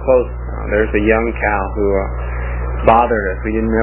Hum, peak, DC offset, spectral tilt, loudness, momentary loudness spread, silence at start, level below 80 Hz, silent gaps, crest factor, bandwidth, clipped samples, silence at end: 60 Hz at -20 dBFS; 0 dBFS; under 0.1%; -11 dB/octave; -16 LUFS; 10 LU; 0 s; -22 dBFS; none; 16 dB; 3.8 kHz; under 0.1%; 0 s